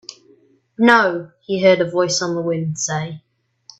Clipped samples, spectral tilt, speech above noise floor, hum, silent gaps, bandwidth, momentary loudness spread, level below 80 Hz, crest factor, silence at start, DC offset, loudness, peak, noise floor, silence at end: under 0.1%; -4 dB/octave; 37 dB; none; none; 8.4 kHz; 17 LU; -64 dBFS; 20 dB; 0.1 s; under 0.1%; -17 LUFS; 0 dBFS; -54 dBFS; 0.6 s